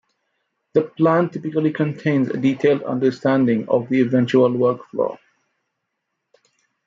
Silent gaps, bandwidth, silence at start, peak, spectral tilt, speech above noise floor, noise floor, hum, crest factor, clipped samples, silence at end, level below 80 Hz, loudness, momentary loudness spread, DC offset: none; 7.4 kHz; 0.75 s; -4 dBFS; -8.5 dB/octave; 59 dB; -77 dBFS; none; 16 dB; under 0.1%; 1.7 s; -68 dBFS; -19 LUFS; 6 LU; under 0.1%